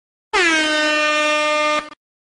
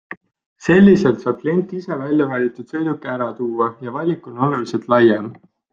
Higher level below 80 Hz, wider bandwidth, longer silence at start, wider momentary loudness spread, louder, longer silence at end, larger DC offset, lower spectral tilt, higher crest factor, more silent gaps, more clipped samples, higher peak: about the same, -56 dBFS vs -56 dBFS; first, 10.5 kHz vs 7.4 kHz; first, 0.35 s vs 0.1 s; second, 6 LU vs 13 LU; about the same, -16 LUFS vs -18 LUFS; about the same, 0.35 s vs 0.4 s; neither; second, -0.5 dB/octave vs -8 dB/octave; about the same, 14 dB vs 16 dB; second, none vs 0.17-0.21 s, 0.46-0.56 s; neither; second, -6 dBFS vs -2 dBFS